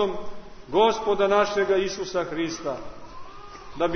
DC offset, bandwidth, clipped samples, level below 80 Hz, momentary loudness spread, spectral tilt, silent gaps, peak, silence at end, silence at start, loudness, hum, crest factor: under 0.1%; 6.6 kHz; under 0.1%; -48 dBFS; 22 LU; -4 dB/octave; none; -6 dBFS; 0 s; 0 s; -24 LUFS; none; 18 dB